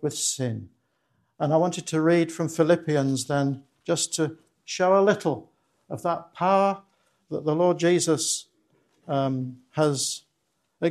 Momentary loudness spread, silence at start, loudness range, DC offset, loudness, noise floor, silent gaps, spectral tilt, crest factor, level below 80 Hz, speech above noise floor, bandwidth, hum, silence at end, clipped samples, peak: 12 LU; 0 s; 2 LU; under 0.1%; -25 LUFS; -74 dBFS; none; -4.5 dB/octave; 18 dB; -72 dBFS; 51 dB; 13 kHz; none; 0 s; under 0.1%; -8 dBFS